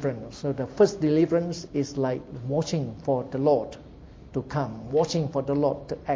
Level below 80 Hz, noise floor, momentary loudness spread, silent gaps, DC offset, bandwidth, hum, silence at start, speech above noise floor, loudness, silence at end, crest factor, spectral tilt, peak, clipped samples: -52 dBFS; -46 dBFS; 10 LU; none; under 0.1%; 8 kHz; none; 0 s; 20 dB; -26 LUFS; 0 s; 18 dB; -7 dB/octave; -8 dBFS; under 0.1%